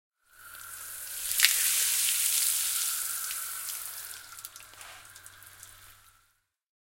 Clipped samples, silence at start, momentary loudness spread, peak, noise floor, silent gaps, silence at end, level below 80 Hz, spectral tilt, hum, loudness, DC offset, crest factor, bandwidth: under 0.1%; 0.4 s; 25 LU; 0 dBFS; -72 dBFS; none; 1 s; -68 dBFS; 4 dB/octave; none; -26 LUFS; under 0.1%; 32 dB; 17 kHz